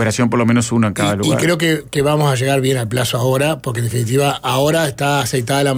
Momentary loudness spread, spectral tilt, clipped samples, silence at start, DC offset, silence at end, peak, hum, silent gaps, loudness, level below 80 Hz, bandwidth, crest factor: 3 LU; -5 dB/octave; under 0.1%; 0 s; under 0.1%; 0 s; -4 dBFS; none; none; -16 LUFS; -46 dBFS; 16.5 kHz; 10 dB